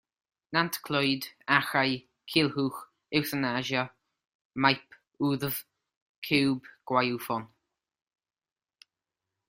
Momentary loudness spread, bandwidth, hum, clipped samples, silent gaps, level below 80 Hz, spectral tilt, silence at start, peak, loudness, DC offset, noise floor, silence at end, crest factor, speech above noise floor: 10 LU; 16 kHz; none; under 0.1%; 4.35-4.50 s, 5.96-6.22 s; -68 dBFS; -4.5 dB/octave; 0.5 s; -6 dBFS; -29 LUFS; under 0.1%; -89 dBFS; 2.05 s; 26 dB; 60 dB